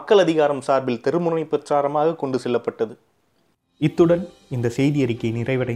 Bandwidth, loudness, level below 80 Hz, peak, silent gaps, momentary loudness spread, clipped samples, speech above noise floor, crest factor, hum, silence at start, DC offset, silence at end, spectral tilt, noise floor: 12 kHz; -21 LUFS; -56 dBFS; -4 dBFS; none; 8 LU; under 0.1%; 45 dB; 16 dB; none; 0 s; under 0.1%; 0 s; -7 dB/octave; -66 dBFS